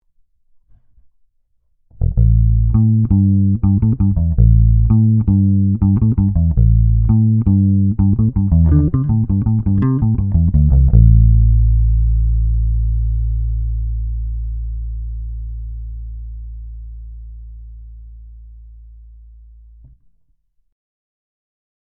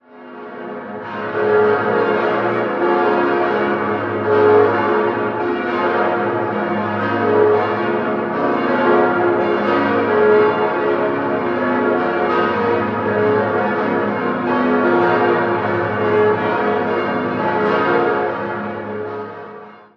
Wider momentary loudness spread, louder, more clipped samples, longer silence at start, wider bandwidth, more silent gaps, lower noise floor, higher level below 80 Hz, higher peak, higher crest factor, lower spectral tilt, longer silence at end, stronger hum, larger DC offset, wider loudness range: first, 18 LU vs 11 LU; about the same, -15 LUFS vs -17 LUFS; neither; first, 2 s vs 0.15 s; second, 1.8 kHz vs 6 kHz; neither; first, -61 dBFS vs -37 dBFS; first, -18 dBFS vs -54 dBFS; about the same, 0 dBFS vs 0 dBFS; about the same, 14 dB vs 16 dB; first, -15 dB/octave vs -8 dB/octave; first, 3.2 s vs 0.2 s; neither; neither; first, 16 LU vs 2 LU